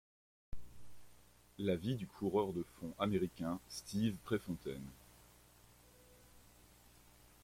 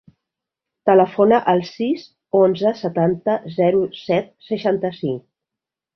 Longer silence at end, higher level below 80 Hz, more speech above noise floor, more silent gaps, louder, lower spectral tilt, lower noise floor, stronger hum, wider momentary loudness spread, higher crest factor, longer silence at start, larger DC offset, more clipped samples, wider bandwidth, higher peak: second, 0.55 s vs 0.75 s; about the same, -64 dBFS vs -62 dBFS; second, 26 dB vs 68 dB; neither; second, -40 LUFS vs -19 LUFS; second, -6.5 dB/octave vs -8 dB/octave; second, -65 dBFS vs -86 dBFS; first, 60 Hz at -65 dBFS vs none; first, 22 LU vs 10 LU; about the same, 20 dB vs 18 dB; second, 0.5 s vs 0.85 s; neither; neither; first, 16.5 kHz vs 6.2 kHz; second, -22 dBFS vs -2 dBFS